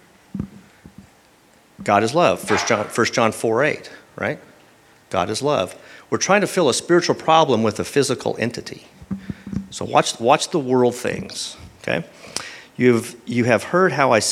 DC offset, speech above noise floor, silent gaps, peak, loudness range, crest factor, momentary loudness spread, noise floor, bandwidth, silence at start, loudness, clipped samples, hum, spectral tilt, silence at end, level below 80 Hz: under 0.1%; 34 dB; none; 0 dBFS; 3 LU; 20 dB; 16 LU; -53 dBFS; 15.5 kHz; 0.35 s; -20 LUFS; under 0.1%; none; -4 dB/octave; 0 s; -54 dBFS